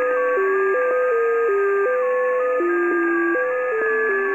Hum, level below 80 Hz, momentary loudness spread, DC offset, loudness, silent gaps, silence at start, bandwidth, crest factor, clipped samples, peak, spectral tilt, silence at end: none; -74 dBFS; 1 LU; 0.1%; -20 LUFS; none; 0 s; 8 kHz; 10 dB; under 0.1%; -10 dBFS; -5.5 dB/octave; 0 s